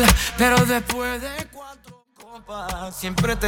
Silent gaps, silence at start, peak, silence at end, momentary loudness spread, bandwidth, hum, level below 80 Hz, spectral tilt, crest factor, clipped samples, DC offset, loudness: none; 0 s; 0 dBFS; 0 s; 20 LU; over 20 kHz; none; -32 dBFS; -4 dB/octave; 22 dB; under 0.1%; under 0.1%; -22 LUFS